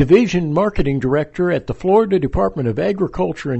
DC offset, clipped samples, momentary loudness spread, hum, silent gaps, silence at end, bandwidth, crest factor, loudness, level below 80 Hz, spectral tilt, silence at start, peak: under 0.1%; under 0.1%; 6 LU; none; none; 0 s; 8.2 kHz; 16 dB; -17 LUFS; -32 dBFS; -7.5 dB/octave; 0 s; -2 dBFS